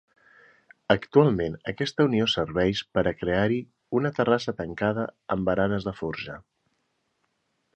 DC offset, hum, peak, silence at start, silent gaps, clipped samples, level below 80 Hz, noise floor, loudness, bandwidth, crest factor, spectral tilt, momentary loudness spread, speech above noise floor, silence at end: under 0.1%; none; -4 dBFS; 0.9 s; none; under 0.1%; -52 dBFS; -74 dBFS; -26 LUFS; 8.6 kHz; 24 dB; -6.5 dB/octave; 11 LU; 49 dB; 1.35 s